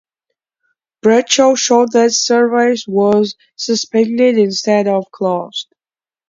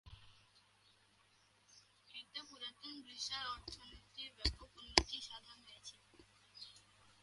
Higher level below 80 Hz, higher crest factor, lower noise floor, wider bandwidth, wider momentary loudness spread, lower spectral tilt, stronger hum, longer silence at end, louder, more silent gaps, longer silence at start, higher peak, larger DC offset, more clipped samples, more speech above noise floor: second, -64 dBFS vs -56 dBFS; second, 14 dB vs 42 dB; first, under -90 dBFS vs -72 dBFS; second, 7.6 kHz vs 11.5 kHz; second, 10 LU vs 27 LU; first, -3.5 dB/octave vs -2 dB/octave; second, none vs 50 Hz at -70 dBFS; first, 0.65 s vs 0.1 s; first, -13 LUFS vs -42 LUFS; neither; first, 1.05 s vs 0.05 s; first, 0 dBFS vs -6 dBFS; neither; neither; first, over 77 dB vs 25 dB